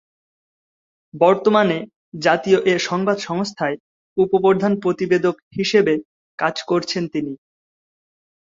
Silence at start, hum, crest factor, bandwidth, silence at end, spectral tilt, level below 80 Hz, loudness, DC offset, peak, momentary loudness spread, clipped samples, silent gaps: 1.15 s; none; 18 dB; 7.8 kHz; 1.15 s; -5.5 dB/octave; -62 dBFS; -19 LUFS; under 0.1%; -2 dBFS; 11 LU; under 0.1%; 1.96-2.12 s, 3.80-4.16 s, 5.42-5.51 s, 6.05-6.38 s